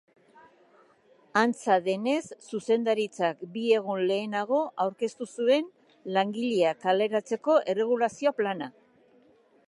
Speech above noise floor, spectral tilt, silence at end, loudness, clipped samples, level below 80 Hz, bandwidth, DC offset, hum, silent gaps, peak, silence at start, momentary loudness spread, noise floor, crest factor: 35 dB; -5 dB/octave; 1 s; -27 LUFS; under 0.1%; -82 dBFS; 11.5 kHz; under 0.1%; none; none; -8 dBFS; 1.35 s; 8 LU; -61 dBFS; 20 dB